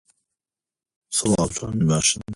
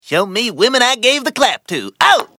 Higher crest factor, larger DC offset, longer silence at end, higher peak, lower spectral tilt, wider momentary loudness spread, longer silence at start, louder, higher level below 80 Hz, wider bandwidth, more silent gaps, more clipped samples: about the same, 18 dB vs 14 dB; neither; second, 0 s vs 0.15 s; second, -6 dBFS vs 0 dBFS; first, -4 dB/octave vs -2 dB/octave; about the same, 6 LU vs 7 LU; first, 1.1 s vs 0.05 s; second, -21 LUFS vs -14 LUFS; first, -46 dBFS vs -60 dBFS; second, 11.5 kHz vs 17 kHz; neither; neither